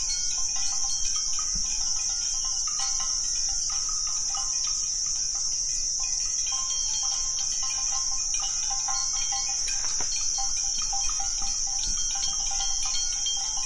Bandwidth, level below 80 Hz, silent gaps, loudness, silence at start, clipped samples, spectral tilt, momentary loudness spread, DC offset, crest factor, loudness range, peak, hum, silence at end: 11.5 kHz; -42 dBFS; none; -25 LUFS; 0 s; under 0.1%; 2.5 dB/octave; 1 LU; under 0.1%; 14 dB; 0 LU; -14 dBFS; none; 0 s